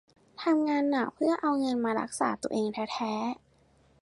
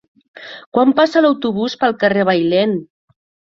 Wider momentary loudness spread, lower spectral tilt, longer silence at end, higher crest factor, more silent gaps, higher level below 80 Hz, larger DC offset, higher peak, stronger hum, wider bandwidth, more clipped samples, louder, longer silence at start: second, 7 LU vs 10 LU; second, -4.5 dB/octave vs -6.5 dB/octave; about the same, 0.65 s vs 0.75 s; about the same, 16 dB vs 16 dB; second, none vs 0.66-0.72 s; second, -70 dBFS vs -60 dBFS; neither; second, -14 dBFS vs 0 dBFS; neither; first, 11.5 kHz vs 7.6 kHz; neither; second, -29 LUFS vs -15 LUFS; about the same, 0.4 s vs 0.35 s